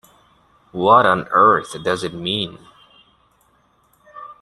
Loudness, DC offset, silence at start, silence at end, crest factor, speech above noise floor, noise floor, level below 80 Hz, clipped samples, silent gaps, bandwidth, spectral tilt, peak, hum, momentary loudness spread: -17 LUFS; under 0.1%; 0.75 s; 0.1 s; 18 dB; 43 dB; -59 dBFS; -58 dBFS; under 0.1%; none; 12.5 kHz; -5 dB/octave; -2 dBFS; none; 20 LU